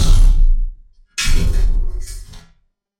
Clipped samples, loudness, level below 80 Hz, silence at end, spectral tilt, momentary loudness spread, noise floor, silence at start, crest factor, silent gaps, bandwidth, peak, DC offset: under 0.1%; -20 LUFS; -14 dBFS; 0.6 s; -4 dB/octave; 18 LU; -57 dBFS; 0 s; 12 dB; none; 11.5 kHz; -2 dBFS; under 0.1%